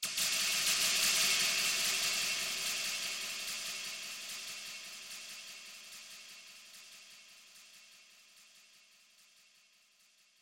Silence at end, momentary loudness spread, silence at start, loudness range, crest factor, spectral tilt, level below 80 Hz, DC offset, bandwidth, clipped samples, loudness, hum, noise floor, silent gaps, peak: 1.8 s; 24 LU; 0 s; 23 LU; 20 dB; 2 dB/octave; -80 dBFS; under 0.1%; 16.5 kHz; under 0.1%; -32 LUFS; none; -68 dBFS; none; -18 dBFS